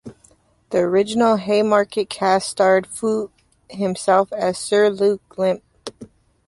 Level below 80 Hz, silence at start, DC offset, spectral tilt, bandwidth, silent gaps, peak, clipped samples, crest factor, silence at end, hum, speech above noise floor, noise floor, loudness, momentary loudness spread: -60 dBFS; 0.05 s; under 0.1%; -4.5 dB/octave; 11.5 kHz; none; -2 dBFS; under 0.1%; 16 dB; 0.45 s; none; 38 dB; -56 dBFS; -19 LUFS; 11 LU